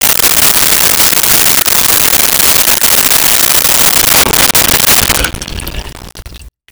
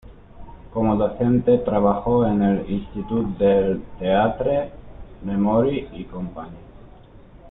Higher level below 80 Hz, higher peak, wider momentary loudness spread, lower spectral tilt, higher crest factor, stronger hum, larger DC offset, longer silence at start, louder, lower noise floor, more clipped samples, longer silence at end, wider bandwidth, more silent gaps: first, -28 dBFS vs -42 dBFS; first, 0 dBFS vs -6 dBFS; second, 8 LU vs 14 LU; second, -0.5 dB/octave vs -12 dB/octave; second, 8 dB vs 16 dB; neither; neither; about the same, 0 s vs 0.05 s; first, -5 LUFS vs -21 LUFS; second, -31 dBFS vs -45 dBFS; neither; first, 0.25 s vs 0 s; first, over 20 kHz vs 4 kHz; neither